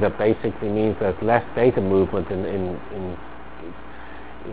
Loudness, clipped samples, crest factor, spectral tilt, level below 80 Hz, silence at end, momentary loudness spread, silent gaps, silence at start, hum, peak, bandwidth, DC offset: -22 LUFS; under 0.1%; 22 dB; -11.5 dB/octave; -42 dBFS; 0 s; 20 LU; none; 0 s; none; -2 dBFS; 4 kHz; 2%